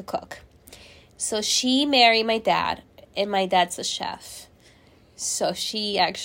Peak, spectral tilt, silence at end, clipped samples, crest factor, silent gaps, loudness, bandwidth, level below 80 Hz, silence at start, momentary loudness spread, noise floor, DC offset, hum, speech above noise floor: -4 dBFS; -2 dB/octave; 0 s; under 0.1%; 22 dB; none; -22 LUFS; 16.5 kHz; -58 dBFS; 0 s; 19 LU; -55 dBFS; under 0.1%; none; 31 dB